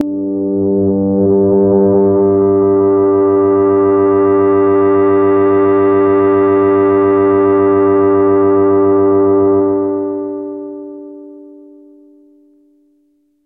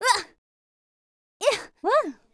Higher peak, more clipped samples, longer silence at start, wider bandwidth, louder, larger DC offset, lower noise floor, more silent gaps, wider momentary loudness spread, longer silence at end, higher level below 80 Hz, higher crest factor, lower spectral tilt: first, 0 dBFS vs -4 dBFS; neither; about the same, 0 s vs 0 s; second, 2.9 kHz vs 11 kHz; first, -11 LUFS vs -25 LUFS; neither; second, -57 dBFS vs under -90 dBFS; second, none vs 0.38-1.40 s; about the same, 7 LU vs 5 LU; first, 1.95 s vs 0.2 s; first, -52 dBFS vs -68 dBFS; second, 10 dB vs 22 dB; first, -12 dB/octave vs -0.5 dB/octave